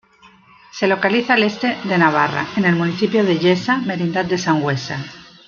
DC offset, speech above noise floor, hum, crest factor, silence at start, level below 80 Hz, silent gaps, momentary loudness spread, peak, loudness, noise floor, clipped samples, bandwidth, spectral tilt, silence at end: under 0.1%; 32 dB; none; 16 dB; 0.75 s; -58 dBFS; none; 7 LU; -2 dBFS; -17 LUFS; -49 dBFS; under 0.1%; 7.2 kHz; -6 dB/octave; 0.25 s